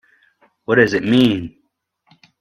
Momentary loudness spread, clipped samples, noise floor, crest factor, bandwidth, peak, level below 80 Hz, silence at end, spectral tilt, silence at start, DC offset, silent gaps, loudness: 19 LU; under 0.1%; -67 dBFS; 20 dB; 10 kHz; 0 dBFS; -52 dBFS; 0.9 s; -6.5 dB/octave; 0.7 s; under 0.1%; none; -16 LUFS